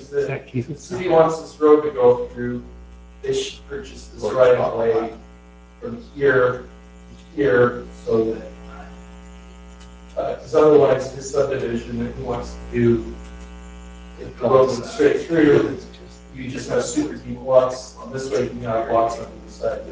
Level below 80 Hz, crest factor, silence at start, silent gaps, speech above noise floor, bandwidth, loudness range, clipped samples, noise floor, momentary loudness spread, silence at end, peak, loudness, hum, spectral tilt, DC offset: -42 dBFS; 20 dB; 0 s; none; 25 dB; 8 kHz; 4 LU; under 0.1%; -45 dBFS; 22 LU; 0 s; -2 dBFS; -20 LUFS; none; -6 dB/octave; under 0.1%